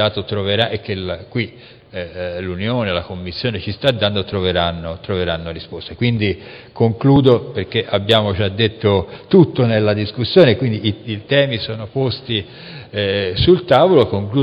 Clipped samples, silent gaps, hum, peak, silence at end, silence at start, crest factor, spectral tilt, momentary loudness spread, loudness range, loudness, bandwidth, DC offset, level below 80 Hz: under 0.1%; none; none; 0 dBFS; 0 s; 0 s; 16 dB; -8 dB/octave; 15 LU; 6 LU; -17 LUFS; 7.8 kHz; under 0.1%; -42 dBFS